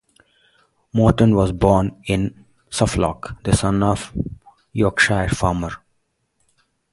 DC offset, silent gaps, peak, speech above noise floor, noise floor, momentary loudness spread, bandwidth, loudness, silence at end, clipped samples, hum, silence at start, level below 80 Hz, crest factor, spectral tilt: under 0.1%; none; 0 dBFS; 51 dB; -69 dBFS; 13 LU; 11.5 kHz; -19 LUFS; 1.15 s; under 0.1%; none; 0.95 s; -34 dBFS; 20 dB; -6 dB/octave